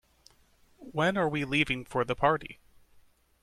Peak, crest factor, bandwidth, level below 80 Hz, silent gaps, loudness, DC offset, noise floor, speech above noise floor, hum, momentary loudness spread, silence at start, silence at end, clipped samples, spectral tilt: -12 dBFS; 20 dB; 14 kHz; -56 dBFS; none; -29 LUFS; under 0.1%; -63 dBFS; 35 dB; none; 7 LU; 0.8 s; 0.9 s; under 0.1%; -5.5 dB/octave